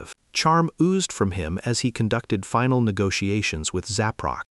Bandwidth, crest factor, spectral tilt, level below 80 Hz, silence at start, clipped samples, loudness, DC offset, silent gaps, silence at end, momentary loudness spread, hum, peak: 11.5 kHz; 16 dB; -5 dB/octave; -48 dBFS; 0 s; under 0.1%; -23 LUFS; under 0.1%; none; 0.1 s; 6 LU; none; -8 dBFS